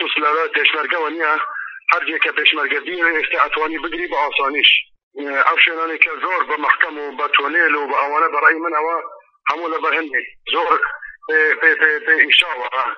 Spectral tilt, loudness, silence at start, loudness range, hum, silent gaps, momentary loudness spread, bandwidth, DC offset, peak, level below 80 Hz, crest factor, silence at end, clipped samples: 4.5 dB/octave; -16 LUFS; 0 s; 3 LU; none; 5.03-5.11 s; 10 LU; 8 kHz; under 0.1%; 0 dBFS; -60 dBFS; 18 dB; 0 s; under 0.1%